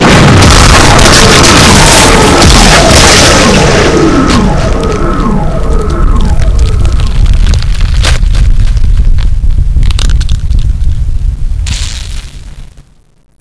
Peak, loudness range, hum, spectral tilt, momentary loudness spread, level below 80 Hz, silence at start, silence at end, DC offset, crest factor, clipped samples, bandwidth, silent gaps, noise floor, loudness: 0 dBFS; 11 LU; none; -4 dB/octave; 13 LU; -8 dBFS; 0 s; 0.75 s; under 0.1%; 4 dB; 10%; 11 kHz; none; -27 dBFS; -6 LUFS